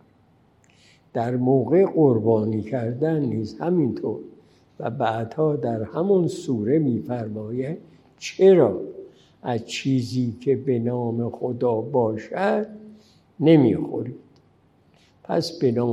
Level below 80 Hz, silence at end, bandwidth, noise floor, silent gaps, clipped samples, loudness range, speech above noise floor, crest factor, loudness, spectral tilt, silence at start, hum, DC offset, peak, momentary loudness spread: -66 dBFS; 0 s; 11 kHz; -59 dBFS; none; under 0.1%; 3 LU; 37 dB; 18 dB; -22 LUFS; -7.5 dB/octave; 1.15 s; none; under 0.1%; -4 dBFS; 14 LU